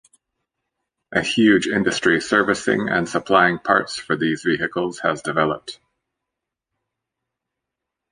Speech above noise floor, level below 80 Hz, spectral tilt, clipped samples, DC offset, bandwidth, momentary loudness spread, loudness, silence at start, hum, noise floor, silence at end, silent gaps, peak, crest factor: 64 dB; -56 dBFS; -4.5 dB/octave; under 0.1%; under 0.1%; 10.5 kHz; 7 LU; -19 LUFS; 1.1 s; none; -83 dBFS; 2.35 s; none; -2 dBFS; 20 dB